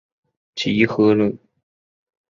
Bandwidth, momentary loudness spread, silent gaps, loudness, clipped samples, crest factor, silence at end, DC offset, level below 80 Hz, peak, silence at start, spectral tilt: 7.4 kHz; 18 LU; none; -18 LUFS; under 0.1%; 20 dB; 1 s; under 0.1%; -56 dBFS; -2 dBFS; 0.55 s; -6.5 dB/octave